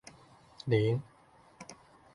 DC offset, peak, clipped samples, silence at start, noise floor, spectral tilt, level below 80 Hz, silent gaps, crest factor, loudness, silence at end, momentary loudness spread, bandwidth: under 0.1%; -14 dBFS; under 0.1%; 0.65 s; -59 dBFS; -7 dB/octave; -64 dBFS; none; 22 dB; -32 LUFS; 0.4 s; 22 LU; 11.5 kHz